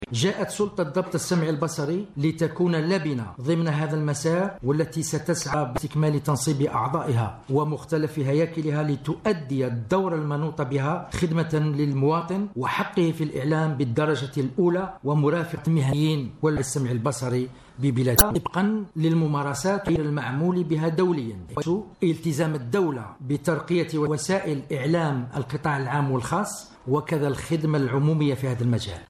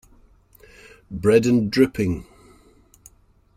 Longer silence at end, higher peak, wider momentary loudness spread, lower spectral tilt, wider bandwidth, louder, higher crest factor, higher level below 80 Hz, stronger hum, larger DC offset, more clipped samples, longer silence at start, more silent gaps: second, 0.05 s vs 1.35 s; first, 0 dBFS vs -4 dBFS; second, 5 LU vs 13 LU; about the same, -6 dB/octave vs -6.5 dB/octave; second, 13.5 kHz vs 15.5 kHz; second, -25 LUFS vs -20 LUFS; about the same, 24 dB vs 20 dB; about the same, -46 dBFS vs -50 dBFS; neither; neither; neither; second, 0 s vs 1.1 s; neither